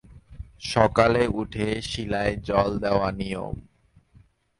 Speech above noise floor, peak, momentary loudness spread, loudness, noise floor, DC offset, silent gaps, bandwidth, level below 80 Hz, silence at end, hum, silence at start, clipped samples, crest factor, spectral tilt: 33 dB; -4 dBFS; 16 LU; -24 LUFS; -57 dBFS; under 0.1%; none; 11.5 kHz; -42 dBFS; 0.95 s; none; 0.1 s; under 0.1%; 22 dB; -6 dB/octave